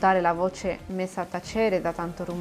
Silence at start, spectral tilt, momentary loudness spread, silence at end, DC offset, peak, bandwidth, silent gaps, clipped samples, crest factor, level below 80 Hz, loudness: 0 s; -6 dB/octave; 9 LU; 0 s; under 0.1%; -8 dBFS; 15 kHz; none; under 0.1%; 18 dB; -50 dBFS; -27 LUFS